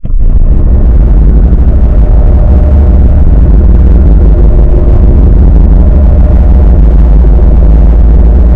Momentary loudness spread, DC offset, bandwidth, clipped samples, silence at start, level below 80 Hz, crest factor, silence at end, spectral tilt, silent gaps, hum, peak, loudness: 2 LU; under 0.1%; 2.3 kHz; 30%; 0.05 s; -2 dBFS; 2 dB; 0 s; -11.5 dB/octave; none; none; 0 dBFS; -6 LUFS